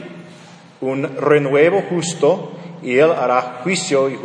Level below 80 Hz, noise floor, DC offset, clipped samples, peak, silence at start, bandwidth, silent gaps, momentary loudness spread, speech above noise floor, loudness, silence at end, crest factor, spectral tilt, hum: -68 dBFS; -42 dBFS; under 0.1%; under 0.1%; 0 dBFS; 0 s; 10 kHz; none; 14 LU; 25 dB; -17 LUFS; 0 s; 18 dB; -5 dB/octave; none